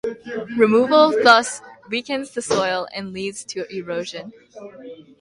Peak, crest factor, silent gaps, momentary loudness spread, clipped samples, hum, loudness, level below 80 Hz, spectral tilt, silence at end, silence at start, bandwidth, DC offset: 0 dBFS; 20 dB; none; 23 LU; under 0.1%; none; -19 LUFS; -62 dBFS; -3.5 dB/octave; 0.2 s; 0.05 s; 11.5 kHz; under 0.1%